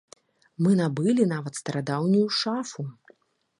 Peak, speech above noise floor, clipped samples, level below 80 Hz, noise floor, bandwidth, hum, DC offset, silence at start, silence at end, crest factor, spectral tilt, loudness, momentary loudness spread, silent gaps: -8 dBFS; 37 dB; under 0.1%; -72 dBFS; -61 dBFS; 11.5 kHz; none; under 0.1%; 0.6 s; 0.7 s; 18 dB; -6 dB/octave; -25 LUFS; 11 LU; none